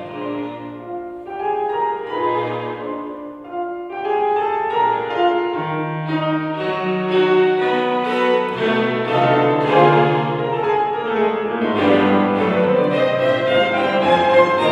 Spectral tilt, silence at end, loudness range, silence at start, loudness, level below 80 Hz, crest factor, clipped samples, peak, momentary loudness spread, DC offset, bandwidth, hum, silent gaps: -7 dB/octave; 0 s; 7 LU; 0 s; -18 LUFS; -60 dBFS; 18 dB; under 0.1%; 0 dBFS; 13 LU; under 0.1%; 9 kHz; none; none